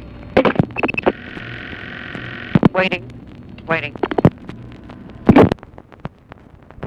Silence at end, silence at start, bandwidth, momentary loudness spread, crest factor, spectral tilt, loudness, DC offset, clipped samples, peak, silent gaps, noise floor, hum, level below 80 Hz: 0 s; 0 s; 9 kHz; 23 LU; 18 dB; -8.5 dB/octave; -17 LUFS; under 0.1%; under 0.1%; 0 dBFS; none; -43 dBFS; none; -40 dBFS